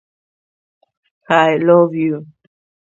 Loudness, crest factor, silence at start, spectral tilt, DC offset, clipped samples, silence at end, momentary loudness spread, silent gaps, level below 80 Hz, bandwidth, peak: -14 LUFS; 18 dB; 1.3 s; -7 dB/octave; under 0.1%; under 0.1%; 0.65 s; 9 LU; none; -66 dBFS; 7.6 kHz; 0 dBFS